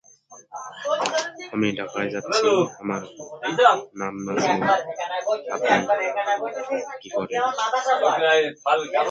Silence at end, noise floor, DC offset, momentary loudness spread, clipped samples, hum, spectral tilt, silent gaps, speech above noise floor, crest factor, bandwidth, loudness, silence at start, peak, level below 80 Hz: 0 s; -50 dBFS; under 0.1%; 12 LU; under 0.1%; none; -3.5 dB/octave; none; 27 dB; 22 dB; 9.4 kHz; -23 LUFS; 0.3 s; -2 dBFS; -66 dBFS